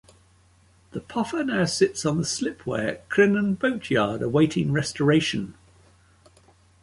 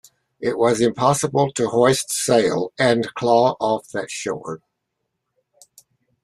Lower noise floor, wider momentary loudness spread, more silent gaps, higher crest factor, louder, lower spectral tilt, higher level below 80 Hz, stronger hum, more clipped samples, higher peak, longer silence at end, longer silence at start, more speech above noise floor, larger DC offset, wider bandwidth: second, -58 dBFS vs -77 dBFS; about the same, 9 LU vs 11 LU; neither; about the same, 18 dB vs 18 dB; second, -24 LUFS vs -19 LUFS; about the same, -5 dB/octave vs -4.5 dB/octave; about the same, -56 dBFS vs -60 dBFS; neither; neither; second, -6 dBFS vs -2 dBFS; second, 1.3 s vs 1.65 s; first, 0.95 s vs 0.4 s; second, 35 dB vs 58 dB; neither; second, 11.5 kHz vs 14 kHz